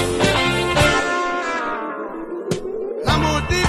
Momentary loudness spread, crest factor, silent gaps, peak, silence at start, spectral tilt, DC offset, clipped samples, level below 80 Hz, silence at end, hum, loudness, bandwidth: 11 LU; 16 dB; none; -4 dBFS; 0 s; -4.5 dB/octave; under 0.1%; under 0.1%; -34 dBFS; 0 s; none; -20 LUFS; 13.5 kHz